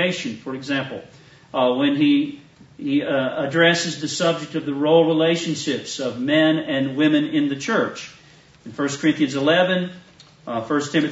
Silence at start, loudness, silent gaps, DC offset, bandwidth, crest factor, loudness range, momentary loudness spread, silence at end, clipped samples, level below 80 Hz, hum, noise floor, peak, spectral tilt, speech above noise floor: 0 s; -20 LUFS; none; under 0.1%; 8 kHz; 18 dB; 3 LU; 13 LU; 0 s; under 0.1%; -66 dBFS; none; -50 dBFS; -4 dBFS; -4.5 dB/octave; 29 dB